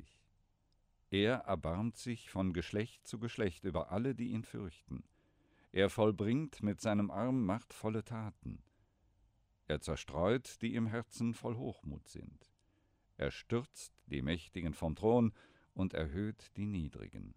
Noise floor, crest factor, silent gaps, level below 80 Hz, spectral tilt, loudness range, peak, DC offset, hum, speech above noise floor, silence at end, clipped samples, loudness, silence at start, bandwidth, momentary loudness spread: -75 dBFS; 20 dB; none; -58 dBFS; -6.5 dB/octave; 6 LU; -18 dBFS; under 0.1%; none; 38 dB; 0.05 s; under 0.1%; -38 LUFS; 0 s; 15.5 kHz; 16 LU